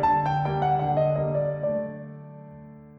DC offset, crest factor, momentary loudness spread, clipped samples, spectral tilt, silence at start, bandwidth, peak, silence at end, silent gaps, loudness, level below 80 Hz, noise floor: under 0.1%; 14 dB; 20 LU; under 0.1%; -9 dB/octave; 0 s; 6 kHz; -12 dBFS; 0 s; none; -25 LUFS; -52 dBFS; -45 dBFS